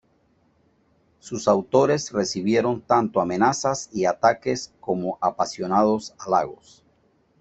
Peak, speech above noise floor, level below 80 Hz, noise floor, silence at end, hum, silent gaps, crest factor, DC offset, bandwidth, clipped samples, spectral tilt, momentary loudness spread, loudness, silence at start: -4 dBFS; 41 dB; -62 dBFS; -63 dBFS; 0.85 s; none; none; 20 dB; under 0.1%; 8.4 kHz; under 0.1%; -5 dB/octave; 8 LU; -23 LUFS; 1.25 s